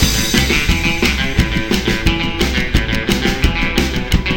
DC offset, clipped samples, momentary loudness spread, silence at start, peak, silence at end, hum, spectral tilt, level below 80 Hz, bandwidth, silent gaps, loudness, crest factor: under 0.1%; under 0.1%; 4 LU; 0 s; 0 dBFS; 0 s; none; -4 dB/octave; -20 dBFS; 18 kHz; none; -15 LUFS; 16 dB